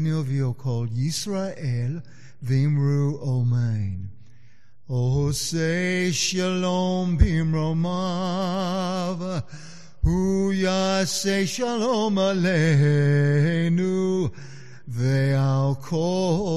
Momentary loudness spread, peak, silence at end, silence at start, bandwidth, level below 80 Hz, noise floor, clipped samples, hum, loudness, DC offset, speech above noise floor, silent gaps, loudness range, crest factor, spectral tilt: 10 LU; -6 dBFS; 0 s; 0 s; 13 kHz; -38 dBFS; -58 dBFS; under 0.1%; none; -23 LUFS; 1%; 35 dB; none; 4 LU; 16 dB; -6 dB/octave